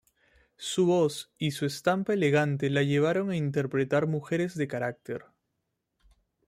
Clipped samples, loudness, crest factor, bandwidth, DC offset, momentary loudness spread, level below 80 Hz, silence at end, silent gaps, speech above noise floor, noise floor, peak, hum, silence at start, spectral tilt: under 0.1%; -28 LUFS; 16 dB; 15 kHz; under 0.1%; 9 LU; -68 dBFS; 1.3 s; none; 54 dB; -81 dBFS; -12 dBFS; none; 0.6 s; -6 dB/octave